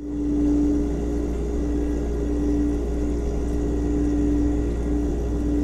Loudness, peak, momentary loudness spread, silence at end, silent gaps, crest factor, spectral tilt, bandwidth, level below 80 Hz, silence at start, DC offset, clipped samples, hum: -24 LUFS; -12 dBFS; 5 LU; 0 s; none; 10 dB; -8.5 dB/octave; 9.2 kHz; -26 dBFS; 0 s; under 0.1%; under 0.1%; none